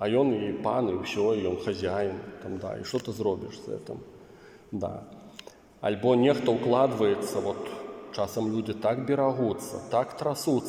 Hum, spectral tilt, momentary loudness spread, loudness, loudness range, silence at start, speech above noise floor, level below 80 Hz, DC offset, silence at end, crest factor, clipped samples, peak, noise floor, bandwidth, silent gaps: none; -6 dB/octave; 15 LU; -28 LUFS; 8 LU; 0 s; 24 dB; -66 dBFS; under 0.1%; 0 s; 18 dB; under 0.1%; -10 dBFS; -51 dBFS; 16 kHz; none